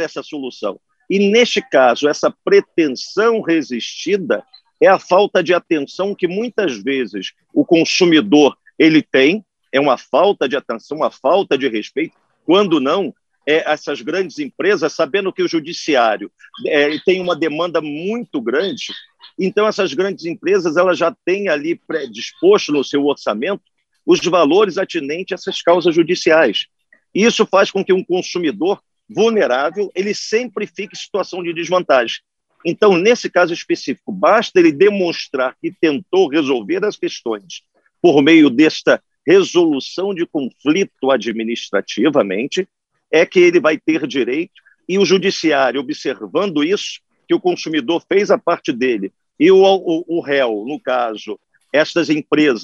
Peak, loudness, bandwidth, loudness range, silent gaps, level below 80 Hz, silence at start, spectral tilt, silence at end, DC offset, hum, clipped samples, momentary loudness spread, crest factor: 0 dBFS; -16 LUFS; 7.6 kHz; 4 LU; none; -68 dBFS; 0 s; -4.5 dB/octave; 0 s; under 0.1%; none; under 0.1%; 12 LU; 16 dB